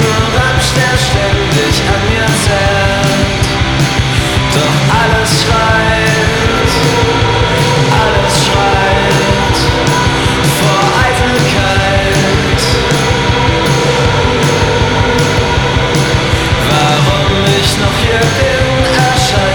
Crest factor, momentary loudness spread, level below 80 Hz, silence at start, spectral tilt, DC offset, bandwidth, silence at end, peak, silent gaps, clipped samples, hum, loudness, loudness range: 10 dB; 2 LU; -22 dBFS; 0 s; -4.5 dB/octave; under 0.1%; 19.5 kHz; 0 s; 0 dBFS; none; under 0.1%; none; -10 LUFS; 1 LU